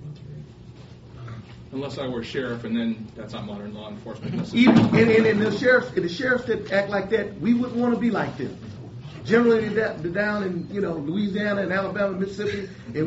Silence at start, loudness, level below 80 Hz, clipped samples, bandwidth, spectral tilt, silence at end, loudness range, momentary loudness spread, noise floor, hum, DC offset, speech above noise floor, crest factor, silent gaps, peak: 0 s; -23 LUFS; -54 dBFS; under 0.1%; 8 kHz; -5 dB/octave; 0 s; 11 LU; 21 LU; -43 dBFS; none; under 0.1%; 21 dB; 20 dB; none; -4 dBFS